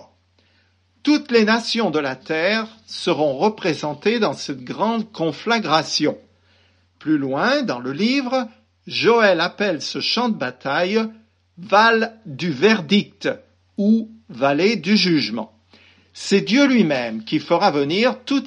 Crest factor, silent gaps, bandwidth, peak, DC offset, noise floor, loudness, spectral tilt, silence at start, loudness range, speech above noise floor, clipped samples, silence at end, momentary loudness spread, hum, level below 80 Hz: 18 dB; none; 9.8 kHz; -2 dBFS; under 0.1%; -60 dBFS; -19 LUFS; -5 dB/octave; 1.05 s; 3 LU; 41 dB; under 0.1%; 0 s; 11 LU; none; -70 dBFS